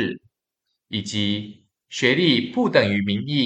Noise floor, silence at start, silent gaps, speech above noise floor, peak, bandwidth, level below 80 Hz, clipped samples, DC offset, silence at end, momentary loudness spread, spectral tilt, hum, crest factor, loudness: -79 dBFS; 0 s; none; 58 dB; -2 dBFS; 8.8 kHz; -66 dBFS; under 0.1%; under 0.1%; 0 s; 14 LU; -5 dB/octave; none; 20 dB; -21 LUFS